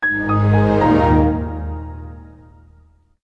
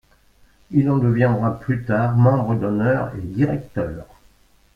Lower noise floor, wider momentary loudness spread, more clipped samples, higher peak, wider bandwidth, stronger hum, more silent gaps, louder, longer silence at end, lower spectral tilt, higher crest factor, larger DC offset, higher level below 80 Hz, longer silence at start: about the same, -51 dBFS vs -54 dBFS; first, 19 LU vs 11 LU; neither; about the same, -4 dBFS vs -4 dBFS; first, 6 kHz vs 5 kHz; neither; neither; first, -16 LUFS vs -20 LUFS; first, 1.05 s vs 0.7 s; about the same, -9.5 dB/octave vs -10.5 dB/octave; about the same, 14 dB vs 16 dB; neither; first, -30 dBFS vs -46 dBFS; second, 0 s vs 0.7 s